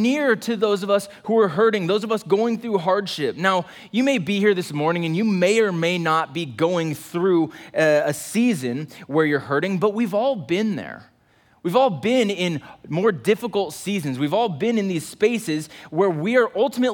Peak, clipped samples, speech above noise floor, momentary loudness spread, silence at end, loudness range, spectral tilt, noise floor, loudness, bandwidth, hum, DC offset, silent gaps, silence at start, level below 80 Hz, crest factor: -4 dBFS; under 0.1%; 37 dB; 7 LU; 0 s; 2 LU; -5.5 dB/octave; -58 dBFS; -21 LUFS; 19 kHz; none; under 0.1%; none; 0 s; -68 dBFS; 16 dB